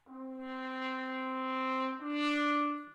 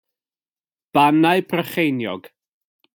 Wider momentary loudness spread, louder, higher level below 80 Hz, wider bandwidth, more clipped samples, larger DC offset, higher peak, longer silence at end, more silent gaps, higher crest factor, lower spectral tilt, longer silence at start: about the same, 11 LU vs 13 LU; second, -35 LUFS vs -19 LUFS; second, -82 dBFS vs -66 dBFS; second, 10.5 kHz vs 18 kHz; neither; neither; second, -22 dBFS vs -4 dBFS; second, 0 s vs 0.7 s; neither; about the same, 14 dB vs 18 dB; second, -3 dB/octave vs -6 dB/octave; second, 0.05 s vs 0.95 s